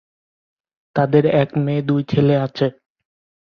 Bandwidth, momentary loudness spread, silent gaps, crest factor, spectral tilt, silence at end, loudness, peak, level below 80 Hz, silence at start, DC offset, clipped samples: 6.2 kHz; 8 LU; none; 18 dB; -9.5 dB/octave; 0.7 s; -18 LUFS; -2 dBFS; -56 dBFS; 0.95 s; under 0.1%; under 0.1%